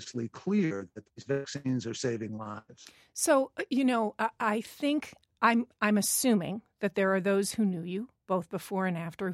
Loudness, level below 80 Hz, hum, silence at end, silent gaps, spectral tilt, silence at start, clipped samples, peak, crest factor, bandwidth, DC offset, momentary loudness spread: -30 LUFS; -74 dBFS; none; 0 s; none; -4.5 dB/octave; 0 s; under 0.1%; -10 dBFS; 20 dB; 16 kHz; under 0.1%; 12 LU